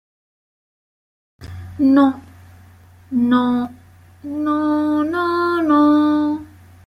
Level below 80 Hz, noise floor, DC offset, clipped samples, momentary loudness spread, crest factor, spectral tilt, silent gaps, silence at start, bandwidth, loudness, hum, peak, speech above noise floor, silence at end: -56 dBFS; -46 dBFS; under 0.1%; under 0.1%; 19 LU; 16 dB; -7 dB/octave; none; 1.4 s; 6 kHz; -17 LUFS; none; -2 dBFS; 30 dB; 0.4 s